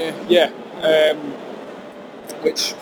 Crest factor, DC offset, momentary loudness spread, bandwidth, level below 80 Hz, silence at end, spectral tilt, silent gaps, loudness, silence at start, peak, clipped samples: 18 dB; under 0.1%; 20 LU; over 20 kHz; -64 dBFS; 0 s; -3 dB/octave; none; -18 LUFS; 0 s; -2 dBFS; under 0.1%